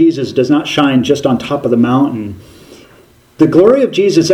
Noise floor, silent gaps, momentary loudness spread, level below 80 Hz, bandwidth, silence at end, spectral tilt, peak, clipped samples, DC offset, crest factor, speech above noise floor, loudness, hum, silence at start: -45 dBFS; none; 7 LU; -50 dBFS; 14 kHz; 0 s; -6 dB/octave; 0 dBFS; 0.2%; under 0.1%; 12 dB; 34 dB; -11 LUFS; none; 0 s